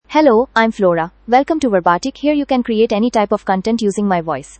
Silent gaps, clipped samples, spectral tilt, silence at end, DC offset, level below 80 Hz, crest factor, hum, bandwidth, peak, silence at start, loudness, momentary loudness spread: none; under 0.1%; -5.5 dB/octave; 0.2 s; under 0.1%; -46 dBFS; 14 dB; none; 8.8 kHz; 0 dBFS; 0.1 s; -15 LUFS; 5 LU